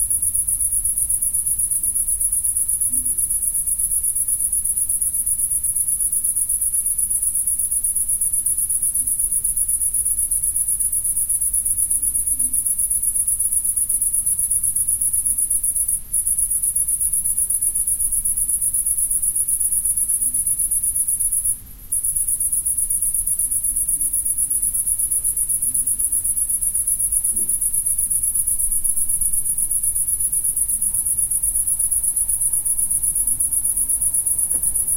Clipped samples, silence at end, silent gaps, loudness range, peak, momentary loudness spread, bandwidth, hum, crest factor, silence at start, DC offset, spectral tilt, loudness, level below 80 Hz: under 0.1%; 0 s; none; 1 LU; -2 dBFS; 1 LU; 16 kHz; none; 18 dB; 0 s; under 0.1%; -1 dB/octave; -17 LUFS; -40 dBFS